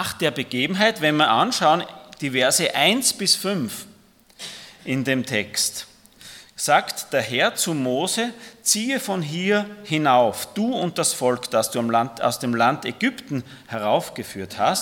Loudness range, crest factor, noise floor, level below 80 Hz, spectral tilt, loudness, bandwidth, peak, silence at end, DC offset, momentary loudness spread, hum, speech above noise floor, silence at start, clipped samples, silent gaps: 5 LU; 20 dB; -53 dBFS; -66 dBFS; -3 dB/octave; -21 LUFS; 18 kHz; -2 dBFS; 0 s; under 0.1%; 14 LU; none; 31 dB; 0 s; under 0.1%; none